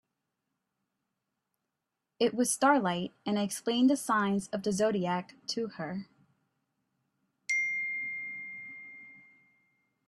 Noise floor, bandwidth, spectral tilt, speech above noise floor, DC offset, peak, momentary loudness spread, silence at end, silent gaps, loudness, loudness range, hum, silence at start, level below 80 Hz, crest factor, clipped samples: -86 dBFS; 14.5 kHz; -4 dB/octave; 57 dB; under 0.1%; -12 dBFS; 16 LU; 0.9 s; none; -30 LUFS; 7 LU; none; 2.2 s; -74 dBFS; 22 dB; under 0.1%